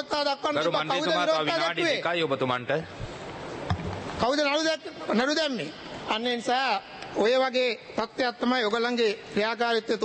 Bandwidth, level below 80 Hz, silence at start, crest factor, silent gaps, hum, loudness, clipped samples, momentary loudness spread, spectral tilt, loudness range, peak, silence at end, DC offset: 8.8 kHz; -54 dBFS; 0 s; 18 dB; none; none; -26 LUFS; under 0.1%; 10 LU; -4 dB/octave; 2 LU; -10 dBFS; 0 s; under 0.1%